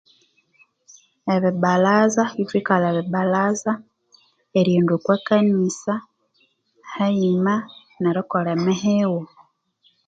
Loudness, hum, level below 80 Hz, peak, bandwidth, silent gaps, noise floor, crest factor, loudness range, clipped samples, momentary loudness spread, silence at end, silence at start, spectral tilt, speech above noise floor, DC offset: -20 LUFS; none; -68 dBFS; -2 dBFS; 8 kHz; none; -64 dBFS; 20 dB; 2 LU; under 0.1%; 10 LU; 0.8 s; 1.25 s; -6.5 dB/octave; 45 dB; under 0.1%